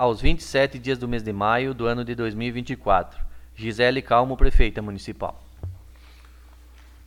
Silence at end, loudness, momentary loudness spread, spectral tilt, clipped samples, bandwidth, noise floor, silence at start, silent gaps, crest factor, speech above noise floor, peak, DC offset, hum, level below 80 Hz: 1.3 s; -24 LUFS; 17 LU; -6 dB/octave; under 0.1%; 10.5 kHz; -47 dBFS; 0 s; none; 20 dB; 26 dB; -2 dBFS; under 0.1%; none; -28 dBFS